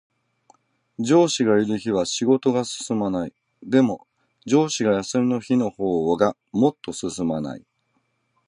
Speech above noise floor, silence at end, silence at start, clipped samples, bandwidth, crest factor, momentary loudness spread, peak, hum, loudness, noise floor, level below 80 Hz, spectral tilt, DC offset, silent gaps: 49 dB; 0.9 s; 1 s; under 0.1%; 11 kHz; 20 dB; 11 LU; -4 dBFS; none; -22 LUFS; -70 dBFS; -58 dBFS; -5 dB/octave; under 0.1%; none